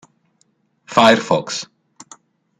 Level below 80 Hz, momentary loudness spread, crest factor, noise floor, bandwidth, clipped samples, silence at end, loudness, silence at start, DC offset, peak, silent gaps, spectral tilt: -60 dBFS; 15 LU; 18 dB; -63 dBFS; 13.5 kHz; under 0.1%; 0.95 s; -16 LUFS; 0.9 s; under 0.1%; 0 dBFS; none; -4 dB/octave